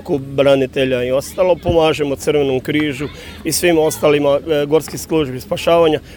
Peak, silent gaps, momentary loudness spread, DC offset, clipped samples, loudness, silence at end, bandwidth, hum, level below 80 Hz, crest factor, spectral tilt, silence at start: 0 dBFS; none; 7 LU; under 0.1%; under 0.1%; -16 LUFS; 0 s; over 20 kHz; none; -40 dBFS; 14 dB; -5 dB/octave; 0 s